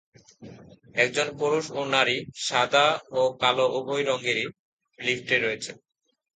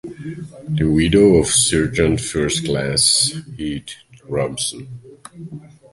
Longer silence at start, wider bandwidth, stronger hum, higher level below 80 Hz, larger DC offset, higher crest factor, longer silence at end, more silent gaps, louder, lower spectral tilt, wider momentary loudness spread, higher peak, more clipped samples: first, 0.4 s vs 0.05 s; second, 9.4 kHz vs 12 kHz; neither; second, -68 dBFS vs -38 dBFS; neither; about the same, 22 dB vs 18 dB; first, 0.65 s vs 0.25 s; first, 4.59-4.79 s vs none; second, -25 LUFS vs -17 LUFS; about the same, -3 dB/octave vs -4 dB/octave; second, 8 LU vs 23 LU; second, -4 dBFS vs 0 dBFS; neither